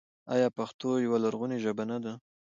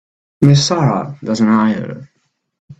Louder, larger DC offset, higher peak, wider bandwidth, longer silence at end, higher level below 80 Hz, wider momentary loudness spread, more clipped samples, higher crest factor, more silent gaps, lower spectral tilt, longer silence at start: second, -31 LUFS vs -14 LUFS; neither; second, -14 dBFS vs 0 dBFS; about the same, 7.6 kHz vs 8.2 kHz; first, 0.35 s vs 0.05 s; second, -78 dBFS vs -50 dBFS; second, 9 LU vs 13 LU; neither; about the same, 18 dB vs 16 dB; about the same, 0.74-0.79 s vs 2.59-2.68 s; about the same, -6.5 dB/octave vs -6 dB/octave; second, 0.25 s vs 0.4 s